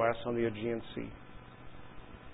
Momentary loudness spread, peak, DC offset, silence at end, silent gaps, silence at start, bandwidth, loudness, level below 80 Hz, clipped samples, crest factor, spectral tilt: 19 LU; -16 dBFS; under 0.1%; 0 s; none; 0 s; 3.9 kHz; -36 LUFS; -58 dBFS; under 0.1%; 20 dB; -3.5 dB/octave